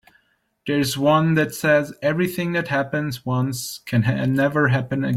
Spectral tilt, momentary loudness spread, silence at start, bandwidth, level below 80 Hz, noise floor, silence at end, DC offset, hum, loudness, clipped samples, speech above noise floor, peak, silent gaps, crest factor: -6 dB/octave; 7 LU; 0.65 s; 16 kHz; -56 dBFS; -66 dBFS; 0 s; under 0.1%; none; -21 LUFS; under 0.1%; 45 dB; -6 dBFS; none; 16 dB